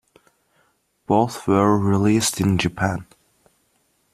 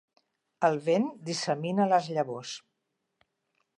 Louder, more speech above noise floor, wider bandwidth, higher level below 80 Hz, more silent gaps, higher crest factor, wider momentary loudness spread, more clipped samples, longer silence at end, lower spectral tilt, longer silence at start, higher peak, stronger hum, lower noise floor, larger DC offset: first, -20 LUFS vs -28 LUFS; second, 47 dB vs 53 dB; first, 14.5 kHz vs 10.5 kHz; first, -52 dBFS vs -84 dBFS; neither; about the same, 18 dB vs 20 dB; second, 7 LU vs 12 LU; neither; about the same, 1.1 s vs 1.2 s; about the same, -5.5 dB/octave vs -5 dB/octave; first, 1.1 s vs 0.6 s; first, -4 dBFS vs -12 dBFS; neither; second, -66 dBFS vs -81 dBFS; neither